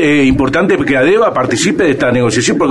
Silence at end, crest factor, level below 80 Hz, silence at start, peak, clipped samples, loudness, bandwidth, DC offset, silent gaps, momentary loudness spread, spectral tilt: 0 s; 10 dB; -34 dBFS; 0 s; -2 dBFS; under 0.1%; -11 LUFS; 12 kHz; under 0.1%; none; 2 LU; -5 dB/octave